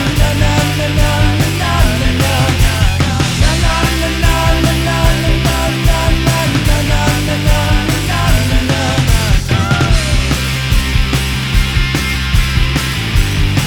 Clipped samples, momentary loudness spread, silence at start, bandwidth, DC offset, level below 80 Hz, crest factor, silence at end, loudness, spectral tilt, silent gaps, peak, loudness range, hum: under 0.1%; 2 LU; 0 s; over 20 kHz; under 0.1%; -16 dBFS; 10 dB; 0 s; -13 LUFS; -4.5 dB/octave; none; 0 dBFS; 1 LU; none